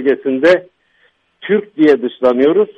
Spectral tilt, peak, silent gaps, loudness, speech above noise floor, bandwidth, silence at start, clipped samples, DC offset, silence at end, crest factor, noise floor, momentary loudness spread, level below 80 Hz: -7 dB/octave; 0 dBFS; none; -13 LUFS; 44 dB; 7.8 kHz; 0 s; under 0.1%; under 0.1%; 0.05 s; 14 dB; -57 dBFS; 6 LU; -60 dBFS